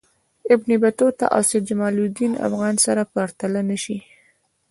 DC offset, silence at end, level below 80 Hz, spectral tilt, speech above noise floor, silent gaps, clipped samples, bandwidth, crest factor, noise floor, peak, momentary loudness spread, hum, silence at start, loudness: under 0.1%; 0.7 s; -64 dBFS; -4.5 dB/octave; 42 dB; none; under 0.1%; 12 kHz; 20 dB; -62 dBFS; -2 dBFS; 8 LU; none; 0.45 s; -20 LUFS